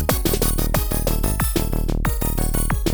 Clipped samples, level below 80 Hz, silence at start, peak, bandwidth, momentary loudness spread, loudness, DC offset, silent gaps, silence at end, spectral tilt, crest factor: under 0.1%; -22 dBFS; 0 s; -4 dBFS; over 20 kHz; 3 LU; -22 LUFS; under 0.1%; none; 0 s; -4.5 dB/octave; 16 dB